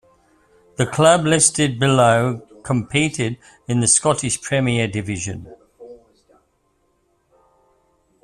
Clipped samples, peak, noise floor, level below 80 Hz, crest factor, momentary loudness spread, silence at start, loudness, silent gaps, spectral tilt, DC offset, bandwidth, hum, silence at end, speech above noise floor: under 0.1%; -2 dBFS; -65 dBFS; -52 dBFS; 20 dB; 13 LU; 0.8 s; -18 LUFS; none; -4 dB/octave; under 0.1%; 12.5 kHz; none; 2.3 s; 47 dB